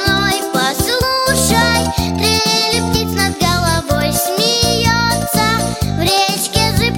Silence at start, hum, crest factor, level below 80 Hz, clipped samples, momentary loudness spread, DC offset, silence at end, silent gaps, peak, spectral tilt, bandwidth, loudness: 0 s; none; 14 dB; -30 dBFS; under 0.1%; 4 LU; under 0.1%; 0 s; none; 0 dBFS; -3.5 dB/octave; 17 kHz; -14 LUFS